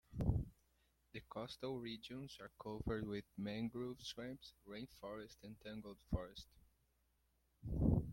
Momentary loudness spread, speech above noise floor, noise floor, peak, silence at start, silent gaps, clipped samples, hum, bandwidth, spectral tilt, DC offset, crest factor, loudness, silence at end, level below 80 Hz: 15 LU; 32 dB; -80 dBFS; -22 dBFS; 0.1 s; none; under 0.1%; none; 16.5 kHz; -7 dB/octave; under 0.1%; 22 dB; -47 LUFS; 0 s; -54 dBFS